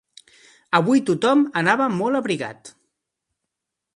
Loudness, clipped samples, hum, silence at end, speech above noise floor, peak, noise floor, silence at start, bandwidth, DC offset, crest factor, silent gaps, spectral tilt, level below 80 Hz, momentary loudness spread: -20 LUFS; under 0.1%; none; 1.25 s; 63 dB; -2 dBFS; -82 dBFS; 0.7 s; 11.5 kHz; under 0.1%; 20 dB; none; -5.5 dB/octave; -68 dBFS; 8 LU